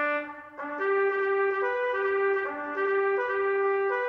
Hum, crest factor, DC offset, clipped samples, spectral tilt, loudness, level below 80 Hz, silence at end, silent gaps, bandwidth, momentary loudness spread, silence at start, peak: none; 12 dB; under 0.1%; under 0.1%; -5.5 dB/octave; -27 LUFS; -72 dBFS; 0 s; none; 5.4 kHz; 6 LU; 0 s; -16 dBFS